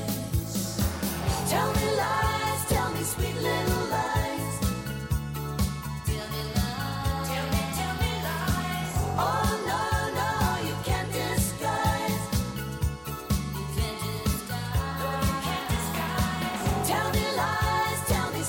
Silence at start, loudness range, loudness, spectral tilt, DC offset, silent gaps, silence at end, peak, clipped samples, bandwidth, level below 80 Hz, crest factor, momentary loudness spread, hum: 0 s; 3 LU; -28 LUFS; -4.5 dB/octave; under 0.1%; none; 0 s; -14 dBFS; under 0.1%; 17 kHz; -38 dBFS; 14 dB; 5 LU; none